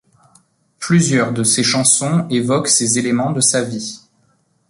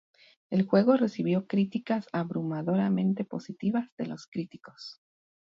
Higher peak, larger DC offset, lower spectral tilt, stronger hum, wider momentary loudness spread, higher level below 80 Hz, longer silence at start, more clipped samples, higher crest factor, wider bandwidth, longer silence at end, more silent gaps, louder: first, 0 dBFS vs -10 dBFS; neither; second, -3.5 dB/octave vs -8.5 dB/octave; neither; second, 10 LU vs 15 LU; first, -56 dBFS vs -72 dBFS; first, 0.8 s vs 0.5 s; neither; about the same, 16 dB vs 18 dB; first, 11.5 kHz vs 7.2 kHz; first, 0.75 s vs 0.5 s; second, none vs 3.92-3.97 s, 4.28-4.32 s; first, -15 LUFS vs -29 LUFS